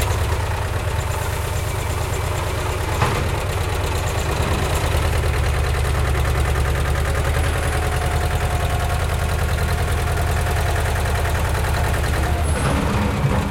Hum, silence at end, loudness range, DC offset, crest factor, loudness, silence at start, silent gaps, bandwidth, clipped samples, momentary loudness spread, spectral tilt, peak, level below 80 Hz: none; 0 s; 2 LU; under 0.1%; 14 dB; -21 LUFS; 0 s; none; 17 kHz; under 0.1%; 3 LU; -5 dB/octave; -4 dBFS; -24 dBFS